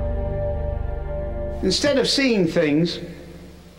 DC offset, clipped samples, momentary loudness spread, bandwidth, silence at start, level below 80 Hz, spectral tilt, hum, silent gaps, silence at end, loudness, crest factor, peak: under 0.1%; under 0.1%; 18 LU; 16.5 kHz; 0 s; -30 dBFS; -5 dB/octave; none; none; 0 s; -22 LUFS; 14 dB; -8 dBFS